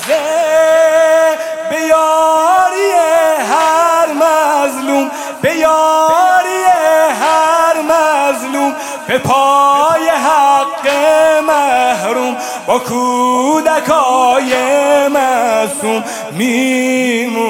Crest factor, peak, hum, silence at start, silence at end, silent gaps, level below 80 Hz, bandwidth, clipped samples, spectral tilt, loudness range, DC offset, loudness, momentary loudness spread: 10 dB; 0 dBFS; none; 0 s; 0 s; none; -56 dBFS; 16.5 kHz; under 0.1%; -3 dB/octave; 2 LU; under 0.1%; -11 LUFS; 7 LU